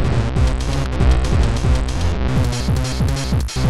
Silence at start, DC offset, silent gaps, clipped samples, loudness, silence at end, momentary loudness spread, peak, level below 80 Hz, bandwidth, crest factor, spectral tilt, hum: 0 s; 4%; none; under 0.1%; -19 LUFS; 0 s; 4 LU; -6 dBFS; -20 dBFS; 12.5 kHz; 12 dB; -6 dB/octave; none